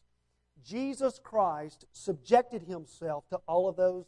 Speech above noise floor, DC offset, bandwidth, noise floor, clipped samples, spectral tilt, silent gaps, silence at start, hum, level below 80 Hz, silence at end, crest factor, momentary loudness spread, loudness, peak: 44 dB; under 0.1%; 11 kHz; -75 dBFS; under 0.1%; -5.5 dB/octave; none; 0.65 s; none; -68 dBFS; 0.05 s; 22 dB; 14 LU; -32 LUFS; -10 dBFS